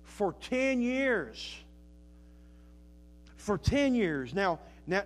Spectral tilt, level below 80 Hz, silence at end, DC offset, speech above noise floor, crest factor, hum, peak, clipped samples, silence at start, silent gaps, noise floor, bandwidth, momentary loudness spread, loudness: -5.5 dB/octave; -50 dBFS; 0 s; under 0.1%; 24 dB; 18 dB; none; -16 dBFS; under 0.1%; 0 s; none; -54 dBFS; 13 kHz; 14 LU; -31 LUFS